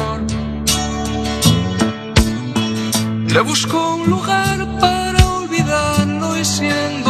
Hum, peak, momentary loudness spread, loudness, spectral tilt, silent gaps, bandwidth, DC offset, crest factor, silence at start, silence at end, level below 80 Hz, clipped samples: none; 0 dBFS; 5 LU; -16 LUFS; -4.5 dB/octave; none; 13.5 kHz; under 0.1%; 16 dB; 0 s; 0 s; -28 dBFS; under 0.1%